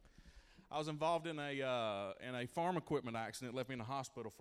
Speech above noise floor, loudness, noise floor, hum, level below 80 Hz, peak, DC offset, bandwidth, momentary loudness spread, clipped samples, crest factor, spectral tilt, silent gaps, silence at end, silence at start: 21 dB; -42 LUFS; -63 dBFS; none; -70 dBFS; -26 dBFS; under 0.1%; 15.5 kHz; 7 LU; under 0.1%; 18 dB; -5 dB/octave; none; 0 s; 0.05 s